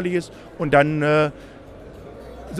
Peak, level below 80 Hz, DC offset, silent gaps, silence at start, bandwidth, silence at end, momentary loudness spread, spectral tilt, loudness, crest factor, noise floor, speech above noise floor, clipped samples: -4 dBFS; -46 dBFS; under 0.1%; none; 0 s; 12 kHz; 0 s; 24 LU; -7 dB/octave; -20 LUFS; 20 dB; -40 dBFS; 20 dB; under 0.1%